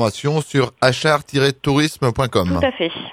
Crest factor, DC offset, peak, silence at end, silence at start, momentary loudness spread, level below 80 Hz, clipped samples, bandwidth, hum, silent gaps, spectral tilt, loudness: 18 dB; under 0.1%; 0 dBFS; 0 s; 0 s; 3 LU; -42 dBFS; under 0.1%; 16 kHz; none; none; -5.5 dB/octave; -18 LUFS